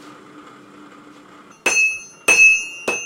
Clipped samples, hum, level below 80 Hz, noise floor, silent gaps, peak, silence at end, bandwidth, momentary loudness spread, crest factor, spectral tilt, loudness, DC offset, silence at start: under 0.1%; none; -62 dBFS; -45 dBFS; none; -2 dBFS; 0 s; 16.5 kHz; 12 LU; 18 dB; 0.5 dB/octave; -14 LUFS; under 0.1%; 0.05 s